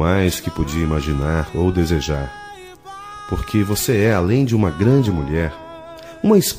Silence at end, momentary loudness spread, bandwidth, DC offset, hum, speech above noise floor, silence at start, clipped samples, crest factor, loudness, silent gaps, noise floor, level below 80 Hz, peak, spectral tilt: 0 s; 20 LU; 15.5 kHz; 0.1%; none; 20 dB; 0 s; under 0.1%; 16 dB; -19 LUFS; none; -37 dBFS; -34 dBFS; -2 dBFS; -6 dB/octave